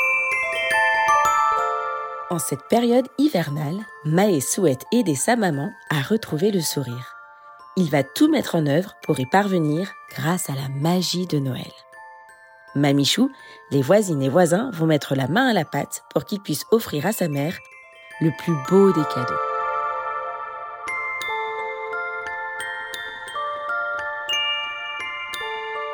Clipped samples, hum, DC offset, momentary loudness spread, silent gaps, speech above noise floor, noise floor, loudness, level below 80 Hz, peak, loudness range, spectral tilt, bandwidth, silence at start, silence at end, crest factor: under 0.1%; none; under 0.1%; 11 LU; none; 26 dB; -47 dBFS; -22 LUFS; -64 dBFS; -4 dBFS; 6 LU; -5 dB/octave; 20 kHz; 0 s; 0 s; 18 dB